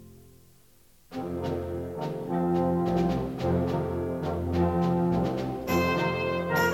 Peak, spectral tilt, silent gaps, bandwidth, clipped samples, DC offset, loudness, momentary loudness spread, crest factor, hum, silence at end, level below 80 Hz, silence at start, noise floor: -12 dBFS; -7 dB/octave; none; 16 kHz; under 0.1%; under 0.1%; -28 LUFS; 8 LU; 16 dB; none; 0 s; -46 dBFS; 0 s; -60 dBFS